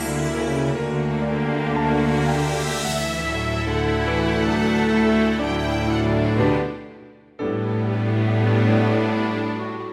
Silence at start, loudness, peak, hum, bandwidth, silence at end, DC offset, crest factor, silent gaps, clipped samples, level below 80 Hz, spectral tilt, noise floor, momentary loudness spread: 0 s; -21 LUFS; -8 dBFS; none; 14.5 kHz; 0 s; under 0.1%; 14 dB; none; under 0.1%; -36 dBFS; -6 dB/octave; -45 dBFS; 6 LU